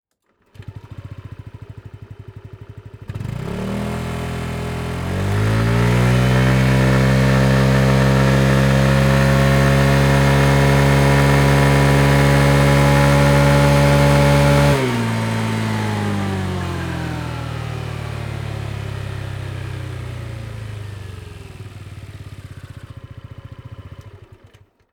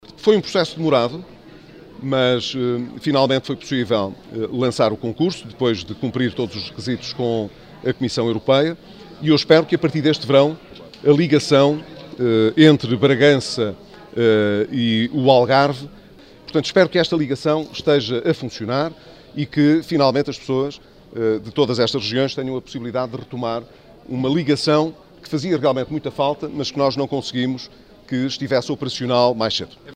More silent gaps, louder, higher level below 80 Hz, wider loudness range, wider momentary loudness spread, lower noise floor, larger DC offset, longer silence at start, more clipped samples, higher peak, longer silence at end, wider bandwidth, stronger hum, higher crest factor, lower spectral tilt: neither; first, -16 LUFS vs -19 LUFS; first, -30 dBFS vs -54 dBFS; first, 20 LU vs 6 LU; first, 23 LU vs 12 LU; first, -63 dBFS vs -44 dBFS; neither; first, 0.6 s vs 0.1 s; neither; about the same, -2 dBFS vs 0 dBFS; first, 0.75 s vs 0 s; first, 20 kHz vs 10 kHz; neither; second, 14 dB vs 20 dB; about the same, -6.5 dB/octave vs -6 dB/octave